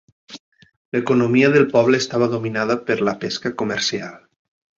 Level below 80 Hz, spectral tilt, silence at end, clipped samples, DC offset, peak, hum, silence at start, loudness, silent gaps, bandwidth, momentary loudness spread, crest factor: -60 dBFS; -5 dB/octave; 0.6 s; under 0.1%; under 0.1%; -2 dBFS; none; 0.3 s; -19 LUFS; 0.40-0.52 s, 0.76-0.92 s; 7.6 kHz; 10 LU; 18 dB